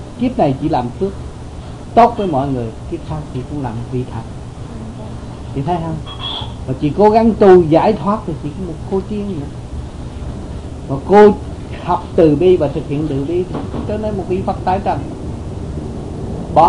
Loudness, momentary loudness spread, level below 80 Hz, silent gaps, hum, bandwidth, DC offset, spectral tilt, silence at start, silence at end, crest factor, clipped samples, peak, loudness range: -16 LUFS; 18 LU; -32 dBFS; none; none; 10.5 kHz; under 0.1%; -8 dB/octave; 0 s; 0 s; 16 dB; under 0.1%; 0 dBFS; 10 LU